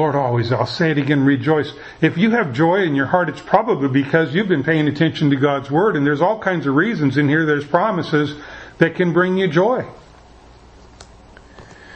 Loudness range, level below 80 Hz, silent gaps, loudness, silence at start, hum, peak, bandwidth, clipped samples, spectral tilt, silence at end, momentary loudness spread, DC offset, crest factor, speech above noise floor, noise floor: 3 LU; -52 dBFS; none; -17 LUFS; 0 s; none; 0 dBFS; 8.4 kHz; under 0.1%; -7.5 dB/octave; 0 s; 4 LU; under 0.1%; 18 dB; 28 dB; -44 dBFS